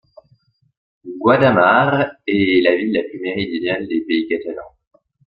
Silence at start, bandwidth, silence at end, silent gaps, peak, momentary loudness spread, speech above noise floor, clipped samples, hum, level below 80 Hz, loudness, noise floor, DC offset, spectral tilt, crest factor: 1.05 s; 5.4 kHz; 0.6 s; none; 0 dBFS; 11 LU; 42 dB; under 0.1%; none; -56 dBFS; -17 LUFS; -58 dBFS; under 0.1%; -9 dB/octave; 18 dB